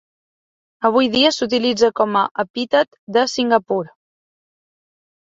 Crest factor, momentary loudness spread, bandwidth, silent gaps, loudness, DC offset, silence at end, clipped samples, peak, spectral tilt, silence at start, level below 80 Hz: 18 dB; 8 LU; 8 kHz; 2.31-2.35 s, 2.50-2.54 s, 2.99-3.07 s; -18 LUFS; under 0.1%; 1.35 s; under 0.1%; -2 dBFS; -3.5 dB/octave; 0.8 s; -60 dBFS